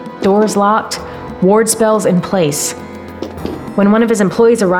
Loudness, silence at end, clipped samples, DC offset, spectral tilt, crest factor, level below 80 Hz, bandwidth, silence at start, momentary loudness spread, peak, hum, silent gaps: -13 LUFS; 0 s; under 0.1%; under 0.1%; -5 dB/octave; 12 dB; -44 dBFS; 17 kHz; 0 s; 15 LU; -2 dBFS; none; none